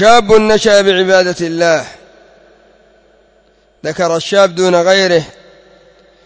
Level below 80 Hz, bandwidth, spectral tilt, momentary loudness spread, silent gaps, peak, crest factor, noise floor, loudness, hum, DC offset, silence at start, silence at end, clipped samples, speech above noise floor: -46 dBFS; 8 kHz; -4 dB/octave; 11 LU; none; 0 dBFS; 12 dB; -51 dBFS; -11 LUFS; none; under 0.1%; 0 s; 0.95 s; 0.2%; 41 dB